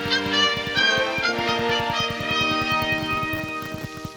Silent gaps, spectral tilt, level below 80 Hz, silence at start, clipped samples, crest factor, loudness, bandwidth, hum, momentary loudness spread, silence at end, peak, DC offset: none; -3.5 dB/octave; -50 dBFS; 0 s; under 0.1%; 18 dB; -22 LUFS; over 20 kHz; none; 9 LU; 0 s; -6 dBFS; under 0.1%